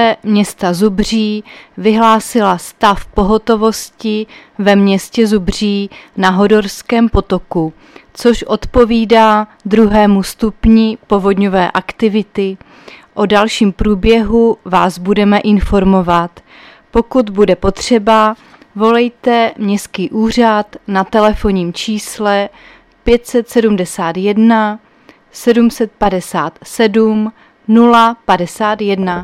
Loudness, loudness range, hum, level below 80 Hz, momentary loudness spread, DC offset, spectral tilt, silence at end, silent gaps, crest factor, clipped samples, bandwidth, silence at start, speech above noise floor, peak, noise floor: -12 LUFS; 3 LU; none; -30 dBFS; 9 LU; under 0.1%; -5.5 dB/octave; 0 s; none; 12 dB; under 0.1%; 14.5 kHz; 0 s; 33 dB; 0 dBFS; -45 dBFS